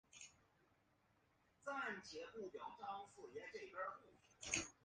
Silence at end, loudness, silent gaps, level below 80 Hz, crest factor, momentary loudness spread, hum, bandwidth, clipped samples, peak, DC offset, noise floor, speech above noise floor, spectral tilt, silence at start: 0.1 s; -50 LUFS; none; -78 dBFS; 30 dB; 15 LU; none; 9.6 kHz; under 0.1%; -22 dBFS; under 0.1%; -79 dBFS; 28 dB; -1.5 dB/octave; 0.15 s